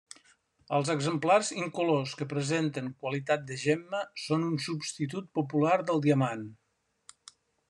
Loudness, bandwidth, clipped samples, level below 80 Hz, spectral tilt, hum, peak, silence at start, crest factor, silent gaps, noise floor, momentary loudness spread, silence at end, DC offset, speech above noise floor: -30 LUFS; 11 kHz; under 0.1%; -74 dBFS; -5.5 dB/octave; none; -12 dBFS; 0.7 s; 20 dB; none; -65 dBFS; 9 LU; 1.15 s; under 0.1%; 36 dB